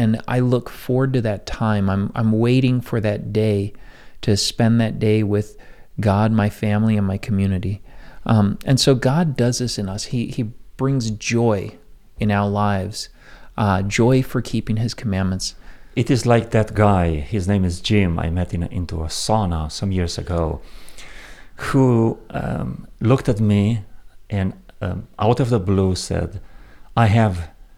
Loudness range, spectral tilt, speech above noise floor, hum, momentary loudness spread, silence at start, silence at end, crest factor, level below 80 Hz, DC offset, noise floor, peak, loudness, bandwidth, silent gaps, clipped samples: 3 LU; -6.5 dB/octave; 20 dB; none; 11 LU; 0 s; 0.25 s; 18 dB; -40 dBFS; under 0.1%; -39 dBFS; -2 dBFS; -20 LUFS; 14.5 kHz; none; under 0.1%